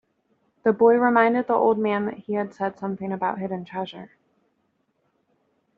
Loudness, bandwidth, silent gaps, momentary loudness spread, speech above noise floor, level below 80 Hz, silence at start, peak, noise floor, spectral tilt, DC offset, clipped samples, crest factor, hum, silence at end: -23 LUFS; 4.8 kHz; none; 14 LU; 49 dB; -70 dBFS; 0.65 s; -4 dBFS; -71 dBFS; -5 dB/octave; under 0.1%; under 0.1%; 20 dB; none; 1.7 s